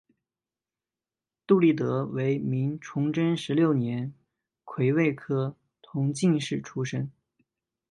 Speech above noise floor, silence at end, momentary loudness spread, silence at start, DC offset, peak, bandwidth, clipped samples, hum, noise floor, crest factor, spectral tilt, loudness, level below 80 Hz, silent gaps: over 64 dB; 0.8 s; 11 LU; 1.5 s; under 0.1%; -8 dBFS; 11 kHz; under 0.1%; none; under -90 dBFS; 20 dB; -7 dB/octave; -27 LUFS; -70 dBFS; none